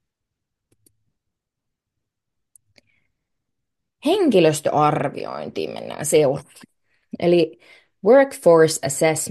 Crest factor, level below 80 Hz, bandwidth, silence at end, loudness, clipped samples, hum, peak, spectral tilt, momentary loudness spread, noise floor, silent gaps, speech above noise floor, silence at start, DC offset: 18 dB; -66 dBFS; 12.5 kHz; 0 s; -18 LUFS; under 0.1%; none; -2 dBFS; -5 dB/octave; 14 LU; -82 dBFS; none; 64 dB; 4.05 s; under 0.1%